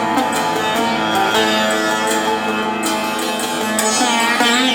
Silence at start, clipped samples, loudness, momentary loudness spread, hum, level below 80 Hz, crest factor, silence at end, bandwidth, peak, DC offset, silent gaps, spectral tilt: 0 s; under 0.1%; -16 LUFS; 5 LU; none; -54 dBFS; 14 dB; 0 s; over 20 kHz; -2 dBFS; under 0.1%; none; -2 dB/octave